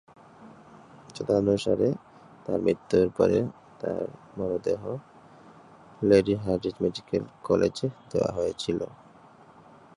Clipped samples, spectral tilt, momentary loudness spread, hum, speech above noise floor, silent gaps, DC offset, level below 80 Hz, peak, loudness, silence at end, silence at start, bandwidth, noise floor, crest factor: under 0.1%; -7 dB/octave; 14 LU; none; 27 dB; none; under 0.1%; -54 dBFS; -8 dBFS; -27 LUFS; 1.1 s; 0.4 s; 11.5 kHz; -53 dBFS; 20 dB